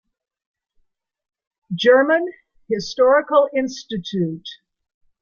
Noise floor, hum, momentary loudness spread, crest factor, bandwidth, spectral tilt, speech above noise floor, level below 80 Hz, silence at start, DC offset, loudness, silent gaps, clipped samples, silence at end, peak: -65 dBFS; none; 16 LU; 18 dB; 7.2 kHz; -5.5 dB/octave; 47 dB; -62 dBFS; 1.7 s; under 0.1%; -18 LUFS; none; under 0.1%; 0.7 s; -2 dBFS